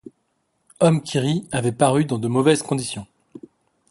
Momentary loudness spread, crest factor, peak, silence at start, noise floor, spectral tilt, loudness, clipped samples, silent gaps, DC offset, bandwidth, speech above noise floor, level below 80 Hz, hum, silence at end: 7 LU; 20 dB; -2 dBFS; 0.8 s; -70 dBFS; -5.5 dB/octave; -20 LUFS; under 0.1%; none; under 0.1%; 11.5 kHz; 51 dB; -58 dBFS; none; 0.55 s